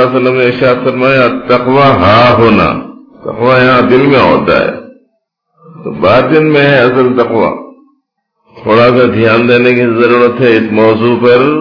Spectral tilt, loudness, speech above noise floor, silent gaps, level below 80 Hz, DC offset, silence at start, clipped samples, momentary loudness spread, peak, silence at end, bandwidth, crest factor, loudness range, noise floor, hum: -8 dB/octave; -7 LUFS; 56 dB; none; -40 dBFS; under 0.1%; 0 s; under 0.1%; 8 LU; 0 dBFS; 0 s; 5.4 kHz; 8 dB; 3 LU; -63 dBFS; none